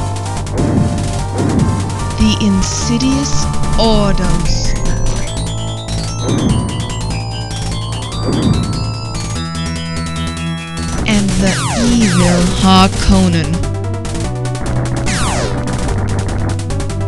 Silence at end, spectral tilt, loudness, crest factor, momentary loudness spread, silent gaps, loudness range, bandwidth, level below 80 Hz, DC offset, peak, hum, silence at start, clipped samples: 0 s; -5 dB/octave; -15 LUFS; 14 dB; 9 LU; none; 6 LU; 12.5 kHz; -22 dBFS; under 0.1%; 0 dBFS; none; 0 s; under 0.1%